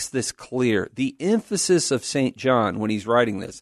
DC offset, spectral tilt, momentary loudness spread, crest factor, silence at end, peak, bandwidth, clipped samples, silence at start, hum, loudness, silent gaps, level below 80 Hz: under 0.1%; -4.5 dB/octave; 6 LU; 18 dB; 0 s; -4 dBFS; 12.5 kHz; under 0.1%; 0 s; none; -22 LUFS; none; -60 dBFS